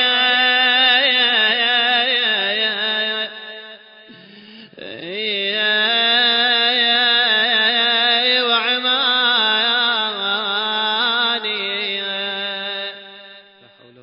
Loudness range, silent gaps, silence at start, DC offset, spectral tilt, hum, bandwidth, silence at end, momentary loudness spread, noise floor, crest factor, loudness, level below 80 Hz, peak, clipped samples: 7 LU; none; 0 s; under 0.1%; -6 dB/octave; none; 5.4 kHz; 0.65 s; 11 LU; -48 dBFS; 16 dB; -15 LUFS; -72 dBFS; -4 dBFS; under 0.1%